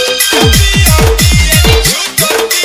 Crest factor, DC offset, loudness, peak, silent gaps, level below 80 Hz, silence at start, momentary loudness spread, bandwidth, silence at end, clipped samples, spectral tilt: 8 dB; under 0.1%; -7 LUFS; 0 dBFS; none; -14 dBFS; 0 s; 3 LU; over 20 kHz; 0 s; 2%; -3 dB/octave